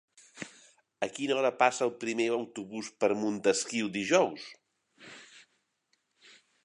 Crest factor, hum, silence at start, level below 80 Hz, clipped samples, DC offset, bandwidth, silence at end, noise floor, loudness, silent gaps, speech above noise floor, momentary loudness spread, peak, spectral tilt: 24 dB; none; 0.35 s; -78 dBFS; under 0.1%; under 0.1%; 11.5 kHz; 1.25 s; -77 dBFS; -30 LUFS; none; 47 dB; 20 LU; -8 dBFS; -3.5 dB/octave